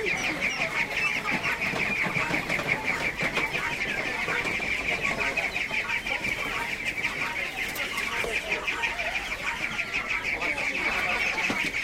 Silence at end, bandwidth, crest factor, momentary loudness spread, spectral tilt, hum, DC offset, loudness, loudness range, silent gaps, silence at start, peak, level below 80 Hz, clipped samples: 0 s; 16 kHz; 18 dB; 3 LU; -2.5 dB/octave; none; under 0.1%; -26 LUFS; 2 LU; none; 0 s; -10 dBFS; -50 dBFS; under 0.1%